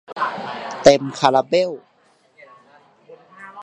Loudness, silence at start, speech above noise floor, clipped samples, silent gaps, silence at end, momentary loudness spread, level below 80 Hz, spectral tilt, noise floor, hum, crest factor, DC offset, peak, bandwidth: -18 LUFS; 0.1 s; 42 dB; under 0.1%; none; 0 s; 23 LU; -54 dBFS; -4.5 dB/octave; -58 dBFS; none; 20 dB; under 0.1%; 0 dBFS; 10 kHz